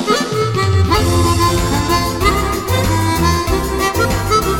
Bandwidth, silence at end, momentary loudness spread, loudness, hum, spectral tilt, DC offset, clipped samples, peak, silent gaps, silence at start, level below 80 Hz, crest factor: 17.5 kHz; 0 s; 3 LU; -15 LUFS; none; -5 dB/octave; under 0.1%; under 0.1%; 0 dBFS; none; 0 s; -24 dBFS; 14 dB